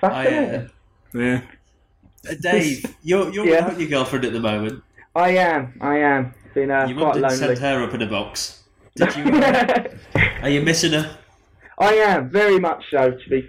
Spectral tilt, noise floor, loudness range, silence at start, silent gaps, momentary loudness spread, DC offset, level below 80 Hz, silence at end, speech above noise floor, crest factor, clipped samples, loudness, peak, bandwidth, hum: -5 dB/octave; -56 dBFS; 3 LU; 0 s; none; 11 LU; under 0.1%; -46 dBFS; 0 s; 37 dB; 18 dB; under 0.1%; -19 LUFS; -2 dBFS; 16 kHz; none